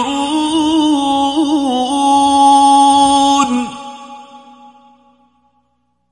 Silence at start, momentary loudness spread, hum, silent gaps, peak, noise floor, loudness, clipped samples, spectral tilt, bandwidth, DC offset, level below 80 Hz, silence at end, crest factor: 0 s; 12 LU; 60 Hz at -60 dBFS; none; 0 dBFS; -64 dBFS; -12 LUFS; under 0.1%; -2.5 dB/octave; 11 kHz; under 0.1%; -48 dBFS; 1.75 s; 14 dB